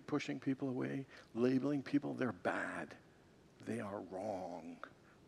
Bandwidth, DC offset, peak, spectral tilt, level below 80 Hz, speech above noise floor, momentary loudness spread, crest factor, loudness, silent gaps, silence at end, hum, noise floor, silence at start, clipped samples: 11 kHz; under 0.1%; -22 dBFS; -6.5 dB/octave; -80 dBFS; 25 dB; 16 LU; 20 dB; -41 LUFS; none; 0 s; none; -65 dBFS; 0 s; under 0.1%